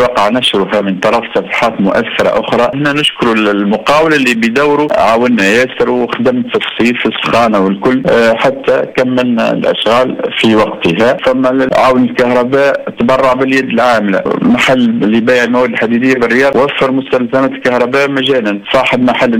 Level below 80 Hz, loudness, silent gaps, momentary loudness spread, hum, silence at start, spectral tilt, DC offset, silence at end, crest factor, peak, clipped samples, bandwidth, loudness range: -44 dBFS; -10 LUFS; none; 4 LU; none; 0 s; -5 dB/octave; under 0.1%; 0 s; 10 dB; 0 dBFS; under 0.1%; 16 kHz; 1 LU